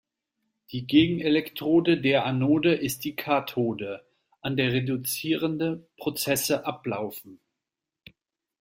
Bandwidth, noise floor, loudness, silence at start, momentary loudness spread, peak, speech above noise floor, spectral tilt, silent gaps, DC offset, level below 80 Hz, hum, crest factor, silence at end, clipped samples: 16.5 kHz; -87 dBFS; -26 LUFS; 0.7 s; 13 LU; -6 dBFS; 62 dB; -5 dB/octave; none; under 0.1%; -62 dBFS; none; 20 dB; 1.25 s; under 0.1%